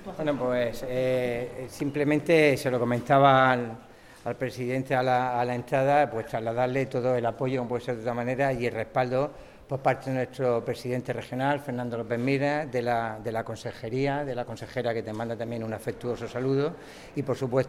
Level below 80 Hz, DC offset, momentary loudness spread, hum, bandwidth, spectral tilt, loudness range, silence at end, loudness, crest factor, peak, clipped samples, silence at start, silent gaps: -56 dBFS; under 0.1%; 11 LU; none; 15.5 kHz; -6.5 dB/octave; 7 LU; 0 s; -27 LUFS; 20 dB; -6 dBFS; under 0.1%; 0 s; none